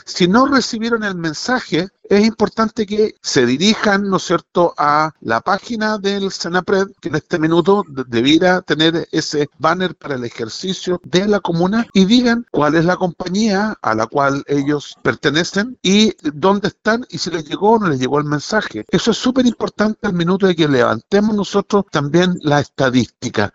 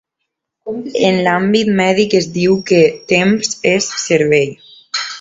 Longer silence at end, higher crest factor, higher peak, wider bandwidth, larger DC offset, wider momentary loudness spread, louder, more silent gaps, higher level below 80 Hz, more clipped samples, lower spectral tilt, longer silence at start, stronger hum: about the same, 0.05 s vs 0 s; about the same, 16 dB vs 14 dB; about the same, 0 dBFS vs 0 dBFS; about the same, 8 kHz vs 8 kHz; neither; second, 7 LU vs 10 LU; about the same, -16 LUFS vs -14 LUFS; neither; first, -48 dBFS vs -54 dBFS; neither; about the same, -5 dB/octave vs -4.5 dB/octave; second, 0.1 s vs 0.65 s; neither